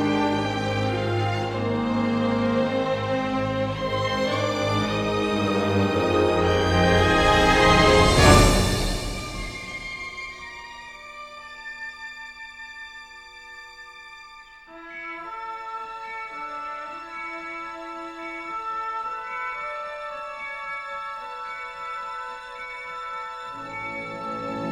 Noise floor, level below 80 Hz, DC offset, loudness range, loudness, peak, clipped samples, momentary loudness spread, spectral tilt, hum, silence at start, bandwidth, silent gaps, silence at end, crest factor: -46 dBFS; -36 dBFS; under 0.1%; 19 LU; -24 LUFS; -2 dBFS; under 0.1%; 21 LU; -5 dB/octave; none; 0 s; 16 kHz; none; 0 s; 22 dB